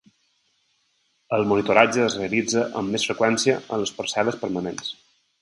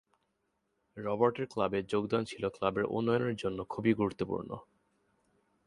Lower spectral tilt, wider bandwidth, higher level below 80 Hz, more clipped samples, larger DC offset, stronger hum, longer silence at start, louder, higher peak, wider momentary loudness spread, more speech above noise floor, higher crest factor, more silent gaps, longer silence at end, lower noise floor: second, -3.5 dB/octave vs -7 dB/octave; about the same, 11.5 kHz vs 11.5 kHz; about the same, -60 dBFS vs -64 dBFS; neither; neither; neither; first, 1.3 s vs 0.95 s; first, -22 LUFS vs -33 LUFS; first, 0 dBFS vs -12 dBFS; about the same, 11 LU vs 9 LU; about the same, 46 dB vs 47 dB; about the same, 24 dB vs 22 dB; neither; second, 0.5 s vs 1.05 s; second, -68 dBFS vs -80 dBFS